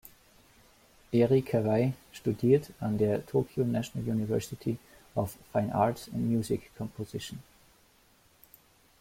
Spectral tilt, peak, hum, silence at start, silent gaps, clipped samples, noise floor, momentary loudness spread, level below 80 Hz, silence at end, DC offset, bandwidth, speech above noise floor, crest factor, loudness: -7.5 dB/octave; -12 dBFS; none; 1.1 s; none; under 0.1%; -64 dBFS; 13 LU; -60 dBFS; 1.6 s; under 0.1%; 16.5 kHz; 34 dB; 20 dB; -30 LUFS